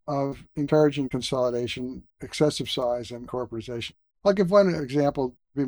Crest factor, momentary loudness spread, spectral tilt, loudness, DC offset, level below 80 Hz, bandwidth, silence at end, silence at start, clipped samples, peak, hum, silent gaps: 18 dB; 14 LU; -6 dB/octave; -25 LUFS; under 0.1%; -54 dBFS; over 20 kHz; 0 s; 0.05 s; under 0.1%; -8 dBFS; none; none